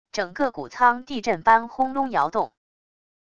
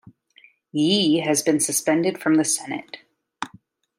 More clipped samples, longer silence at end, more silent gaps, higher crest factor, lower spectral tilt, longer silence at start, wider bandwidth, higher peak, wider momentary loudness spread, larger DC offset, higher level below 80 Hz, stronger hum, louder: neither; first, 0.8 s vs 0.5 s; neither; about the same, 20 dB vs 16 dB; about the same, -4.5 dB/octave vs -3.5 dB/octave; second, 0.15 s vs 0.75 s; second, 7.6 kHz vs 16 kHz; about the same, -4 dBFS vs -6 dBFS; second, 9 LU vs 16 LU; first, 0.4% vs under 0.1%; first, -60 dBFS vs -72 dBFS; neither; about the same, -23 LUFS vs -21 LUFS